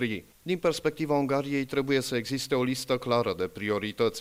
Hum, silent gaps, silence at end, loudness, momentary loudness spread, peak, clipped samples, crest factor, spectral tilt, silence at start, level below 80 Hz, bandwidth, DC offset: none; none; 0 s; -29 LUFS; 4 LU; -12 dBFS; under 0.1%; 16 dB; -5 dB/octave; 0 s; -62 dBFS; 16 kHz; under 0.1%